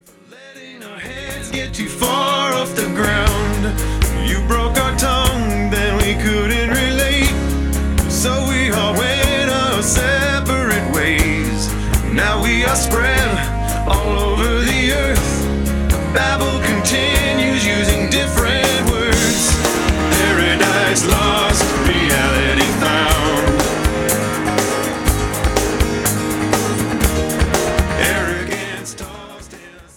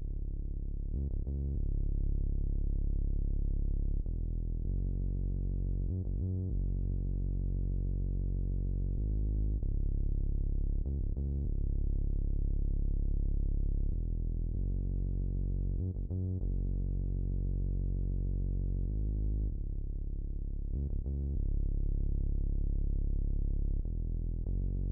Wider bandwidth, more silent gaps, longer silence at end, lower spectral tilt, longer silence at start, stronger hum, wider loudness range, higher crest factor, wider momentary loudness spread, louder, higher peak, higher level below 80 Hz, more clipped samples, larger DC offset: first, 18 kHz vs 0.9 kHz; neither; first, 0.15 s vs 0 s; second, -4 dB/octave vs -15.5 dB/octave; first, 0.4 s vs 0 s; neither; about the same, 3 LU vs 1 LU; first, 16 dB vs 8 dB; first, 6 LU vs 3 LU; first, -16 LUFS vs -37 LUFS; first, 0 dBFS vs -24 dBFS; first, -22 dBFS vs -32 dBFS; neither; neither